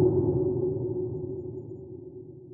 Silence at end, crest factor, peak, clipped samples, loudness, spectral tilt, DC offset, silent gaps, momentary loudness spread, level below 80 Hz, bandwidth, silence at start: 0 s; 16 dB; -12 dBFS; under 0.1%; -30 LUFS; -16 dB/octave; under 0.1%; none; 17 LU; -56 dBFS; 1.4 kHz; 0 s